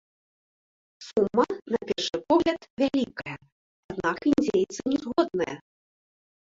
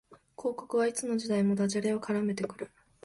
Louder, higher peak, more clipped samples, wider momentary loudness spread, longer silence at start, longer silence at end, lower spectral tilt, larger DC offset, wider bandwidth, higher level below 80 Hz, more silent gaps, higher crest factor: first, -26 LUFS vs -31 LUFS; first, -8 dBFS vs -18 dBFS; neither; first, 15 LU vs 9 LU; first, 1 s vs 0.1 s; first, 0.9 s vs 0.35 s; about the same, -5 dB/octave vs -5.5 dB/octave; neither; second, 7.8 kHz vs 11.5 kHz; first, -60 dBFS vs -70 dBFS; first, 2.70-2.77 s, 3.52-3.89 s vs none; first, 20 dB vs 14 dB